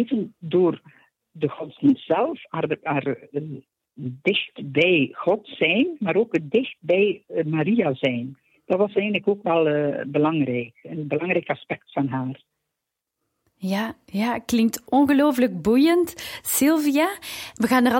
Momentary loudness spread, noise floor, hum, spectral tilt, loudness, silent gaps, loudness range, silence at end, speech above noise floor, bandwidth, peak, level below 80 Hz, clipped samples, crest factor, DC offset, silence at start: 12 LU; -83 dBFS; none; -5 dB/octave; -22 LUFS; none; 7 LU; 0 s; 61 dB; 16.5 kHz; -6 dBFS; -62 dBFS; under 0.1%; 16 dB; under 0.1%; 0 s